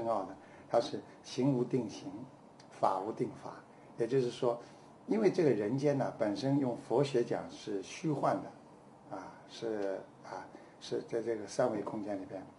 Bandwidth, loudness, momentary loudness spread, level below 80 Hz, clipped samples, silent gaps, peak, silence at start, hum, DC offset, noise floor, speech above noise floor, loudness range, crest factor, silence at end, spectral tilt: 11.5 kHz; -35 LUFS; 18 LU; -76 dBFS; under 0.1%; none; -14 dBFS; 0 s; none; under 0.1%; -57 dBFS; 22 dB; 7 LU; 22 dB; 0.05 s; -6.5 dB/octave